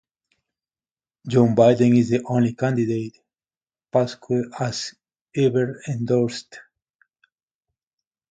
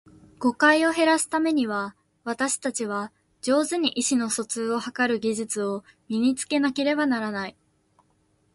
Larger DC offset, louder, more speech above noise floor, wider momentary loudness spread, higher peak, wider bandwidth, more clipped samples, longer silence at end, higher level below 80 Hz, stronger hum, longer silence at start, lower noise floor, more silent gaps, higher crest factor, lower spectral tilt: neither; first, -21 LUFS vs -24 LUFS; first, over 70 dB vs 42 dB; first, 15 LU vs 12 LU; about the same, -4 dBFS vs -6 dBFS; second, 9.2 kHz vs 12 kHz; neither; first, 1.7 s vs 1.05 s; first, -62 dBFS vs -68 dBFS; neither; first, 1.25 s vs 0.4 s; first, under -90 dBFS vs -66 dBFS; first, 3.57-3.61 s, 5.22-5.26 s vs none; about the same, 20 dB vs 18 dB; first, -7 dB/octave vs -3 dB/octave